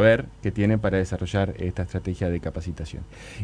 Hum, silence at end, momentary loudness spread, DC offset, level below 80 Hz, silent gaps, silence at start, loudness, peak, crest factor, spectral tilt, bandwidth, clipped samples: none; 0 s; 13 LU; under 0.1%; -40 dBFS; none; 0 s; -26 LUFS; -4 dBFS; 20 dB; -7.5 dB/octave; 10.5 kHz; under 0.1%